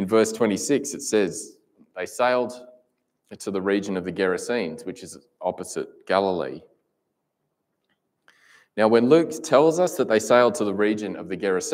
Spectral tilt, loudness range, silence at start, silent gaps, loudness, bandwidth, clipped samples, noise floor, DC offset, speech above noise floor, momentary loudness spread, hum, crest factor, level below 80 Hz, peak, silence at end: -4.5 dB/octave; 9 LU; 0 s; none; -23 LUFS; 16 kHz; under 0.1%; -77 dBFS; under 0.1%; 55 dB; 17 LU; none; 20 dB; -70 dBFS; -4 dBFS; 0 s